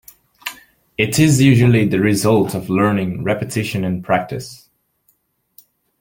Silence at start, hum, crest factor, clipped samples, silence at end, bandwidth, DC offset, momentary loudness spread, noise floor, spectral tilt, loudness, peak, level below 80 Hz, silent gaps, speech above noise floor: 0.45 s; none; 16 dB; under 0.1%; 1.45 s; 17 kHz; under 0.1%; 19 LU; -63 dBFS; -6 dB/octave; -16 LUFS; -2 dBFS; -50 dBFS; none; 47 dB